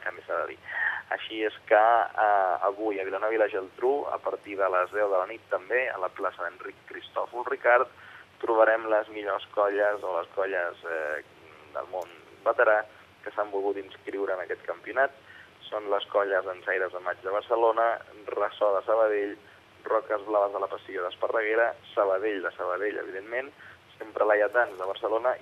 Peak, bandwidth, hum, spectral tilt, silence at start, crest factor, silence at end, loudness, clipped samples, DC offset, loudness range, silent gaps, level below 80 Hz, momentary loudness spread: -8 dBFS; 7.8 kHz; none; -5 dB/octave; 0 s; 20 dB; 0 s; -28 LUFS; under 0.1%; under 0.1%; 4 LU; none; -80 dBFS; 13 LU